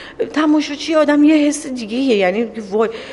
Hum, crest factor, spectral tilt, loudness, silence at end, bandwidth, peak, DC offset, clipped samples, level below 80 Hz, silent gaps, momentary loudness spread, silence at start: none; 14 dB; -4.5 dB/octave; -16 LUFS; 0 s; 11.5 kHz; -2 dBFS; under 0.1%; under 0.1%; -54 dBFS; none; 10 LU; 0 s